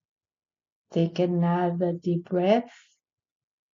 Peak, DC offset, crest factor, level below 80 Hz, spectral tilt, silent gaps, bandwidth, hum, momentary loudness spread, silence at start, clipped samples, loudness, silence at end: -10 dBFS; under 0.1%; 18 dB; -68 dBFS; -7 dB/octave; none; 7 kHz; none; 6 LU; 0.9 s; under 0.1%; -26 LUFS; 1.05 s